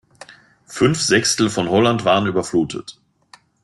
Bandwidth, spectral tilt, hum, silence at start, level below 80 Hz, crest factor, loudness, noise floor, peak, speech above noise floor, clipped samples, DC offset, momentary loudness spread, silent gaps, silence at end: 12 kHz; -4 dB/octave; none; 0.3 s; -54 dBFS; 16 dB; -17 LUFS; -51 dBFS; -2 dBFS; 34 dB; under 0.1%; under 0.1%; 14 LU; none; 0.75 s